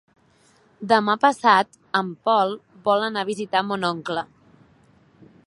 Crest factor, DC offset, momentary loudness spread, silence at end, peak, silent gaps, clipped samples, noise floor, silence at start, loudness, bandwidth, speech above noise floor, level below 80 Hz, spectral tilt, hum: 22 dB; under 0.1%; 11 LU; 1.2 s; -2 dBFS; none; under 0.1%; -58 dBFS; 0.8 s; -21 LUFS; 11.5 kHz; 37 dB; -70 dBFS; -4.5 dB/octave; none